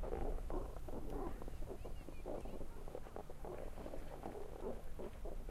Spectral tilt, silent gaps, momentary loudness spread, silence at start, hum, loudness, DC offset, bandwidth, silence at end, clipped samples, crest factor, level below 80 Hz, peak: -7 dB/octave; none; 6 LU; 0 s; none; -50 LUFS; under 0.1%; 14.5 kHz; 0 s; under 0.1%; 16 dB; -48 dBFS; -28 dBFS